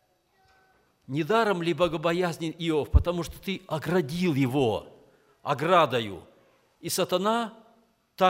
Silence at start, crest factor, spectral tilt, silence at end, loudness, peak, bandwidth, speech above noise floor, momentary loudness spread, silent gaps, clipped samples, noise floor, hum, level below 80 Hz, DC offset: 1.1 s; 22 dB; -5.5 dB/octave; 0 s; -27 LUFS; -6 dBFS; 16 kHz; 41 dB; 12 LU; none; under 0.1%; -66 dBFS; none; -40 dBFS; under 0.1%